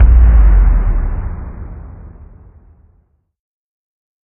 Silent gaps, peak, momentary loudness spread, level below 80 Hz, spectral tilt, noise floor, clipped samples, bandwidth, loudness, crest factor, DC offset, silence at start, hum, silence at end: none; 0 dBFS; 24 LU; -14 dBFS; -12.5 dB/octave; -56 dBFS; under 0.1%; 2.6 kHz; -13 LUFS; 12 dB; under 0.1%; 0 s; none; 2.15 s